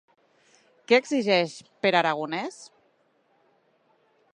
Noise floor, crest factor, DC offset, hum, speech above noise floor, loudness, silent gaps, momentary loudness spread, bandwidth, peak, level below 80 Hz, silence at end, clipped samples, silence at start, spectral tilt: -67 dBFS; 24 dB; under 0.1%; none; 42 dB; -24 LUFS; none; 11 LU; 10.5 kHz; -6 dBFS; -80 dBFS; 1.7 s; under 0.1%; 0.9 s; -4.5 dB/octave